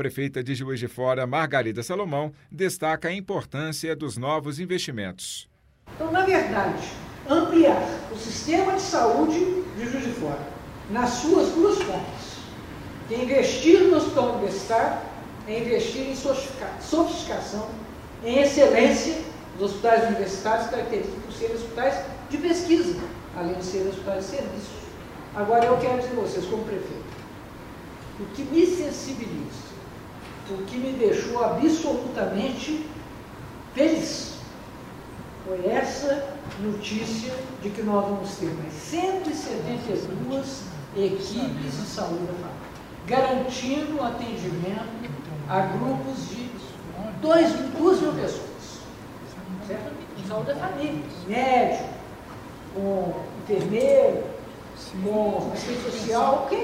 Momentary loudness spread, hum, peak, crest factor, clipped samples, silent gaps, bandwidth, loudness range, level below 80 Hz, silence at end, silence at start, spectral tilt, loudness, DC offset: 18 LU; none; -2 dBFS; 22 dB; under 0.1%; none; 16 kHz; 7 LU; -50 dBFS; 0 s; 0 s; -5 dB/octave; -25 LUFS; under 0.1%